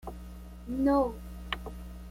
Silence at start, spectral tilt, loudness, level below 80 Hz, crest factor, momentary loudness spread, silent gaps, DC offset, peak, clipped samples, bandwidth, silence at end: 0 s; -6.5 dB/octave; -31 LUFS; -44 dBFS; 20 dB; 20 LU; none; under 0.1%; -14 dBFS; under 0.1%; 16 kHz; 0 s